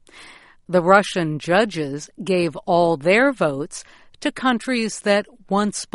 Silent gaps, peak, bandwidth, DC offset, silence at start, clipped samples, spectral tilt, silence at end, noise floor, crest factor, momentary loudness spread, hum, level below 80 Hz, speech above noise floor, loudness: none; 0 dBFS; 11.5 kHz; under 0.1%; 0.15 s; under 0.1%; -5 dB/octave; 0.1 s; -46 dBFS; 20 dB; 12 LU; none; -56 dBFS; 26 dB; -20 LUFS